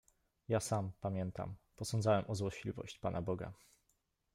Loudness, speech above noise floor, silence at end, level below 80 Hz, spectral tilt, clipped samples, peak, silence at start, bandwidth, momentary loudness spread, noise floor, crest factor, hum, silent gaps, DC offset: -39 LUFS; 42 dB; 0.8 s; -64 dBFS; -6 dB/octave; under 0.1%; -20 dBFS; 0.5 s; 16 kHz; 12 LU; -81 dBFS; 18 dB; none; none; under 0.1%